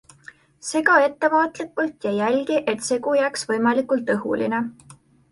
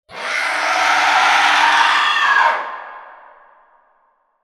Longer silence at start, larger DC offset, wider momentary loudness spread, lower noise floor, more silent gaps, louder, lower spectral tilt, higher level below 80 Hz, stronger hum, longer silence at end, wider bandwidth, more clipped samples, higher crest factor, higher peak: first, 0.65 s vs 0.1 s; neither; second, 9 LU vs 12 LU; second, -48 dBFS vs -61 dBFS; neither; second, -21 LUFS vs -14 LUFS; first, -4 dB/octave vs 1 dB/octave; about the same, -66 dBFS vs -66 dBFS; neither; second, 0.4 s vs 1.3 s; second, 11.5 kHz vs 16 kHz; neither; about the same, 20 dB vs 16 dB; about the same, -2 dBFS vs 0 dBFS